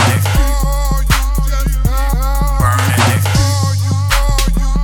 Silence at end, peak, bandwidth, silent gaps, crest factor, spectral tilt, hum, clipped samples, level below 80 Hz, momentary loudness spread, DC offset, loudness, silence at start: 0 s; -2 dBFS; 19 kHz; none; 10 dB; -4.5 dB/octave; none; under 0.1%; -14 dBFS; 5 LU; under 0.1%; -14 LUFS; 0 s